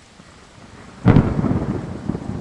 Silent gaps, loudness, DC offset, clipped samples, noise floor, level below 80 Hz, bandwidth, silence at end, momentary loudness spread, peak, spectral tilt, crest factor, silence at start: none; -19 LUFS; under 0.1%; under 0.1%; -45 dBFS; -34 dBFS; 9.8 kHz; 0 s; 12 LU; 0 dBFS; -9 dB/octave; 20 dB; 0.6 s